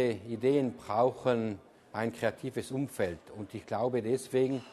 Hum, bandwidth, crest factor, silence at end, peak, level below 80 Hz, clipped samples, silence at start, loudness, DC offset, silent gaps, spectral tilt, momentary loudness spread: none; 13 kHz; 18 dB; 0 s; -14 dBFS; -68 dBFS; under 0.1%; 0 s; -32 LUFS; under 0.1%; none; -6.5 dB/octave; 12 LU